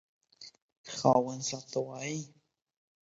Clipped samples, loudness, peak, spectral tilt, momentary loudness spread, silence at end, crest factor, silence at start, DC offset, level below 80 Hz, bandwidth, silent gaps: under 0.1%; -32 LUFS; -10 dBFS; -5 dB/octave; 24 LU; 0.8 s; 26 dB; 0.4 s; under 0.1%; -74 dBFS; 8 kHz; 0.62-0.84 s